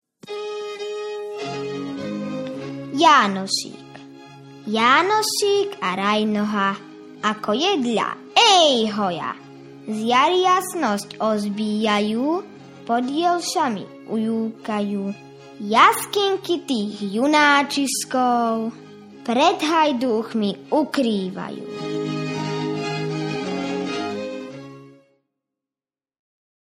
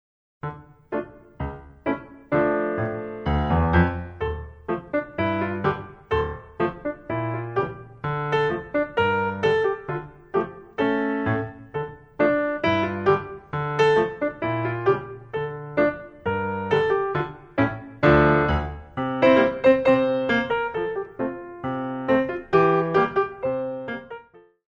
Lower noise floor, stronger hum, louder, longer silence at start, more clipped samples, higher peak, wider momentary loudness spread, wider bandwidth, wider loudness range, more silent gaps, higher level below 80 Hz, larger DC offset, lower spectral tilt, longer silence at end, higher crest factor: first, under -90 dBFS vs -49 dBFS; neither; first, -21 LUFS vs -24 LUFS; second, 0.25 s vs 0.45 s; neither; first, 0 dBFS vs -4 dBFS; about the same, 16 LU vs 14 LU; first, 15.5 kHz vs 8.2 kHz; about the same, 8 LU vs 7 LU; neither; second, -68 dBFS vs -40 dBFS; neither; second, -3.5 dB/octave vs -8 dB/octave; first, 1.9 s vs 0.35 s; about the same, 22 dB vs 20 dB